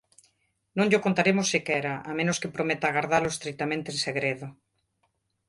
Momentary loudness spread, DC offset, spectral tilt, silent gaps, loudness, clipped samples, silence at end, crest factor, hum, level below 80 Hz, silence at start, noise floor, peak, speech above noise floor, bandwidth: 8 LU; under 0.1%; -4 dB/octave; none; -26 LUFS; under 0.1%; 0.95 s; 20 dB; none; -64 dBFS; 0.75 s; -74 dBFS; -8 dBFS; 48 dB; 11.5 kHz